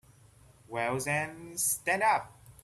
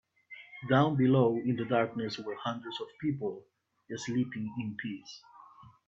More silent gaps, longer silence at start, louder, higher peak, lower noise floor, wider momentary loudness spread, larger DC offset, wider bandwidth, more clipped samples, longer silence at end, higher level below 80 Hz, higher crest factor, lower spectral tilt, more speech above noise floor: neither; first, 0.7 s vs 0.3 s; about the same, -30 LUFS vs -31 LUFS; about the same, -14 dBFS vs -12 dBFS; about the same, -59 dBFS vs -56 dBFS; second, 11 LU vs 22 LU; neither; first, 15.5 kHz vs 7.8 kHz; neither; about the same, 0.1 s vs 0.2 s; first, -66 dBFS vs -72 dBFS; about the same, 20 dB vs 20 dB; second, -3 dB/octave vs -7 dB/octave; about the same, 28 dB vs 25 dB